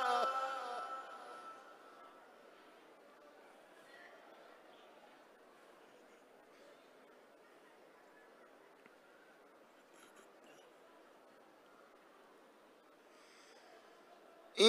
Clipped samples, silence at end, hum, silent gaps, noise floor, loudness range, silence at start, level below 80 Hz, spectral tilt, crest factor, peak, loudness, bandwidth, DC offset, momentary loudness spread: under 0.1%; 0 s; none; none; -65 dBFS; 11 LU; 0 s; under -90 dBFS; -2 dB/octave; 30 dB; -16 dBFS; -45 LUFS; 15 kHz; under 0.1%; 18 LU